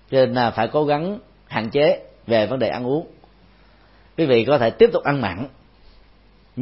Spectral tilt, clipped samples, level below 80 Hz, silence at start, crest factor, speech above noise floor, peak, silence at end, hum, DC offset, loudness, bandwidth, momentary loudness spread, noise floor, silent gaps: -11 dB/octave; under 0.1%; -52 dBFS; 0.1 s; 18 dB; 34 dB; -2 dBFS; 0 s; none; under 0.1%; -20 LUFS; 5.8 kHz; 14 LU; -52 dBFS; none